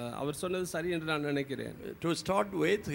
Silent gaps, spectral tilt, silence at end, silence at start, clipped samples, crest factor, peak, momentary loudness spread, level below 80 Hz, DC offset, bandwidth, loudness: none; -5 dB/octave; 0 s; 0 s; under 0.1%; 18 dB; -14 dBFS; 8 LU; -60 dBFS; under 0.1%; 17 kHz; -33 LUFS